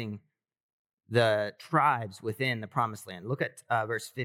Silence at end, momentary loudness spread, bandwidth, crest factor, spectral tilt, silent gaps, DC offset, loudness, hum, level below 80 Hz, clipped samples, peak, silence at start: 0 s; 11 LU; 16 kHz; 20 dB; -5.5 dB/octave; 0.63-0.85 s, 0.93-0.98 s; under 0.1%; -30 LUFS; none; -84 dBFS; under 0.1%; -10 dBFS; 0 s